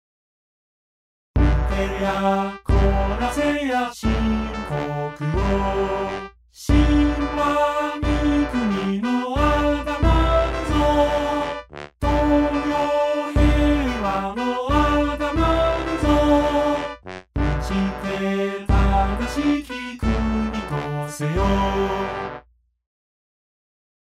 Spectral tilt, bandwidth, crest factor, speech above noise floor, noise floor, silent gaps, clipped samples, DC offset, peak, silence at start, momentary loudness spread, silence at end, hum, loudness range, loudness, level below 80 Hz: -6.5 dB/octave; 13 kHz; 16 dB; 31 dB; -50 dBFS; none; under 0.1%; under 0.1%; -4 dBFS; 1.35 s; 8 LU; 1.65 s; none; 3 LU; -21 LUFS; -26 dBFS